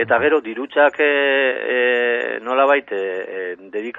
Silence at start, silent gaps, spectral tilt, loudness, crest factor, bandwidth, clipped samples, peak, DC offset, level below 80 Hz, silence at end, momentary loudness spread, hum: 0 s; none; -5.5 dB/octave; -18 LUFS; 16 dB; 7.4 kHz; under 0.1%; -2 dBFS; under 0.1%; -68 dBFS; 0 s; 12 LU; none